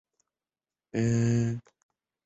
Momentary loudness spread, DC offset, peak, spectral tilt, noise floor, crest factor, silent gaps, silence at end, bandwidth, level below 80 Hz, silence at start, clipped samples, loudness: 11 LU; under 0.1%; -16 dBFS; -7 dB/octave; under -90 dBFS; 16 dB; none; 0.65 s; 8 kHz; -60 dBFS; 0.95 s; under 0.1%; -28 LUFS